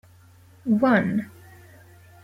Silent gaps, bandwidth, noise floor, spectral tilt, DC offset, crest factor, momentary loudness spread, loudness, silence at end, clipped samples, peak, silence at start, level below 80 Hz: none; 15 kHz; -52 dBFS; -8 dB/octave; under 0.1%; 18 dB; 16 LU; -22 LUFS; 0.95 s; under 0.1%; -8 dBFS; 0.65 s; -64 dBFS